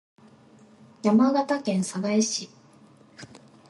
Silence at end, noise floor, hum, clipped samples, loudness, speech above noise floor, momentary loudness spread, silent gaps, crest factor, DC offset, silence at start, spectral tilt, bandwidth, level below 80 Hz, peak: 0.45 s; -54 dBFS; none; under 0.1%; -24 LUFS; 31 dB; 25 LU; none; 18 dB; under 0.1%; 1.05 s; -5 dB/octave; 11.5 kHz; -74 dBFS; -8 dBFS